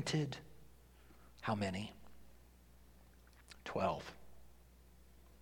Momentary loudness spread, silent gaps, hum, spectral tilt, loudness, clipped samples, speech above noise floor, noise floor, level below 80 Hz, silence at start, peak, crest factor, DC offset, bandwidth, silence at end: 26 LU; none; 60 Hz at -65 dBFS; -5.5 dB/octave; -42 LUFS; under 0.1%; 24 dB; -63 dBFS; -64 dBFS; 0 s; -24 dBFS; 22 dB; under 0.1%; 18 kHz; 0.05 s